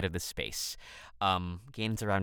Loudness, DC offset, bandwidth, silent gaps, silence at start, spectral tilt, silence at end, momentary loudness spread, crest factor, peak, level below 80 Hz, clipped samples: -34 LUFS; under 0.1%; over 20 kHz; none; 0 s; -4 dB/octave; 0 s; 11 LU; 18 dB; -16 dBFS; -56 dBFS; under 0.1%